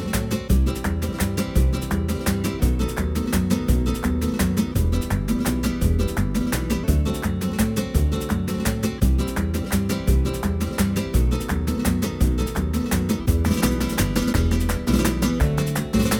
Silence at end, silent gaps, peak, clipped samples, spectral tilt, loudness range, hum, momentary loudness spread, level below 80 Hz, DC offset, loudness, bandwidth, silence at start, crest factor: 0 s; none; -6 dBFS; under 0.1%; -6 dB/octave; 1 LU; none; 3 LU; -26 dBFS; under 0.1%; -23 LUFS; 19.5 kHz; 0 s; 16 dB